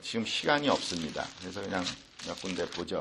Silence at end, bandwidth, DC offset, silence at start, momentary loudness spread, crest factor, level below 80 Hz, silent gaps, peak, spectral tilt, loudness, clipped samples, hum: 0 s; 12.5 kHz; under 0.1%; 0 s; 12 LU; 22 dB; -62 dBFS; none; -12 dBFS; -3.5 dB/octave; -32 LUFS; under 0.1%; none